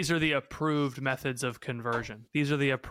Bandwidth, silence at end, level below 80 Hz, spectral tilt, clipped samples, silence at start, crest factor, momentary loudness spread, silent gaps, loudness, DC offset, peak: 16 kHz; 0 s; -58 dBFS; -5 dB/octave; under 0.1%; 0 s; 16 dB; 7 LU; none; -30 LUFS; under 0.1%; -14 dBFS